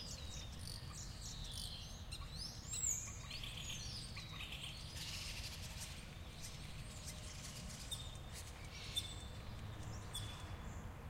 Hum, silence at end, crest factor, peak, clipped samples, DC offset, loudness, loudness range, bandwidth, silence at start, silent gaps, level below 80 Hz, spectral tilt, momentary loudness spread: none; 0 s; 22 dB; -26 dBFS; under 0.1%; under 0.1%; -47 LUFS; 4 LU; 16 kHz; 0 s; none; -54 dBFS; -2.5 dB/octave; 8 LU